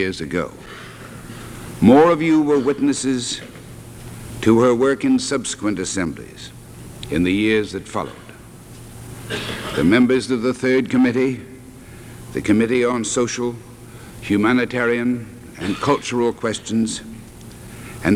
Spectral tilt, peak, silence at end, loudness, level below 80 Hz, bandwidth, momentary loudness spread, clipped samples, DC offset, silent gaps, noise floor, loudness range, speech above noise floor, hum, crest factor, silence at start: -5 dB/octave; 0 dBFS; 0 s; -19 LUFS; -46 dBFS; 15 kHz; 23 LU; under 0.1%; under 0.1%; none; -40 dBFS; 5 LU; 22 dB; none; 20 dB; 0 s